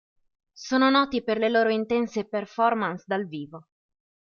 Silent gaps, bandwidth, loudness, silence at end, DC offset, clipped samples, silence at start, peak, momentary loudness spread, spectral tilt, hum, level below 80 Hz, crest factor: none; 7 kHz; -24 LUFS; 0.75 s; under 0.1%; under 0.1%; 0.6 s; -6 dBFS; 14 LU; -5 dB/octave; none; -66 dBFS; 20 dB